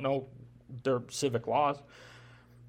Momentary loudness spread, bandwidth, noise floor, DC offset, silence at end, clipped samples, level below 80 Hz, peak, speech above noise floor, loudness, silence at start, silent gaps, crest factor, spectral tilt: 23 LU; 16.5 kHz; -55 dBFS; under 0.1%; 0 s; under 0.1%; -68 dBFS; -16 dBFS; 23 dB; -32 LUFS; 0 s; none; 18 dB; -5 dB/octave